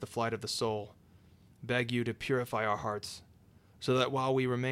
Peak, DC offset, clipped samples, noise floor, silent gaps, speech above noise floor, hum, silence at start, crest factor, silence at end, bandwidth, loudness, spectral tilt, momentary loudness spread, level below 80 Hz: -16 dBFS; under 0.1%; under 0.1%; -61 dBFS; none; 28 dB; none; 0 s; 18 dB; 0 s; 15.5 kHz; -33 LUFS; -5 dB/octave; 12 LU; -66 dBFS